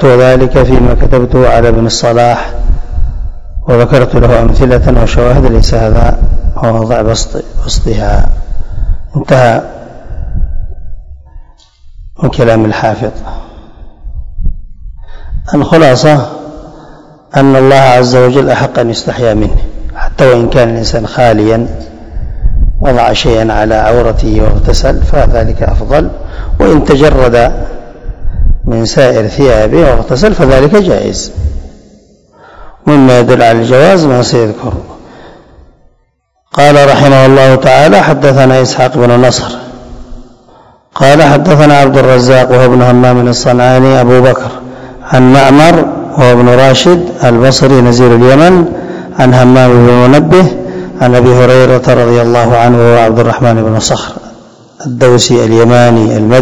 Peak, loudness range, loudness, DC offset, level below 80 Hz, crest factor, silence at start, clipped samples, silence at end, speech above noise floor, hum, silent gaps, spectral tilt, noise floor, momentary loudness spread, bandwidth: 0 dBFS; 8 LU; -6 LUFS; 2%; -16 dBFS; 6 dB; 0 s; 10%; 0 s; 52 dB; none; none; -6 dB/octave; -56 dBFS; 16 LU; 11 kHz